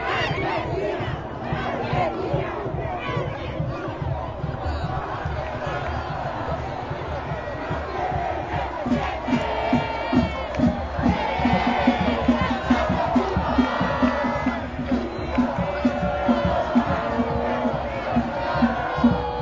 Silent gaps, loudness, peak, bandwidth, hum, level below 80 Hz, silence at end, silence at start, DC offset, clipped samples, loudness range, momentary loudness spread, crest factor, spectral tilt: none; -24 LUFS; -6 dBFS; 7.6 kHz; none; -36 dBFS; 0 s; 0 s; under 0.1%; under 0.1%; 7 LU; 7 LU; 18 dB; -7.5 dB/octave